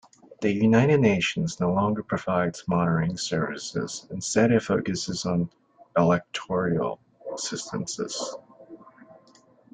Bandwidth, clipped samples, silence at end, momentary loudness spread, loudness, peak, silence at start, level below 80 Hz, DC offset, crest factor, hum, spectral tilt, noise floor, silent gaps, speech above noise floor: 9.4 kHz; under 0.1%; 0.9 s; 12 LU; -25 LUFS; -6 dBFS; 0.3 s; -58 dBFS; under 0.1%; 18 dB; none; -5.5 dB/octave; -57 dBFS; none; 33 dB